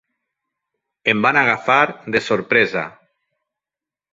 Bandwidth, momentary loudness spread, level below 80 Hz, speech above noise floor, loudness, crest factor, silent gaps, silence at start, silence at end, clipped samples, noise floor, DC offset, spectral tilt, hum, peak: 7.8 kHz; 8 LU; -60 dBFS; 72 dB; -17 LUFS; 20 dB; none; 1.05 s; 1.25 s; under 0.1%; -89 dBFS; under 0.1%; -5 dB/octave; none; -2 dBFS